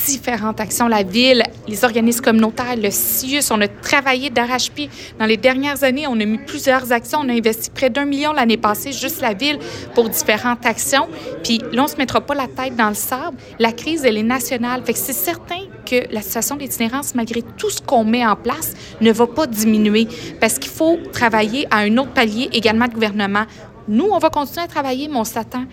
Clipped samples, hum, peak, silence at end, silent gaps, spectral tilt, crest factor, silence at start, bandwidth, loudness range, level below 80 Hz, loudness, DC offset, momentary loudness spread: under 0.1%; none; 0 dBFS; 0 s; none; -3 dB/octave; 16 dB; 0 s; 16.5 kHz; 3 LU; -48 dBFS; -17 LUFS; under 0.1%; 7 LU